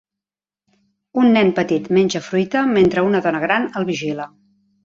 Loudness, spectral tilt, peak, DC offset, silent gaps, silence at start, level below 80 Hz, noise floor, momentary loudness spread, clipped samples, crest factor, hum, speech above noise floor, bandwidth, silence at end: -17 LUFS; -6 dB/octave; -2 dBFS; under 0.1%; none; 1.15 s; -56 dBFS; -90 dBFS; 10 LU; under 0.1%; 16 dB; none; 73 dB; 7.6 kHz; 0.6 s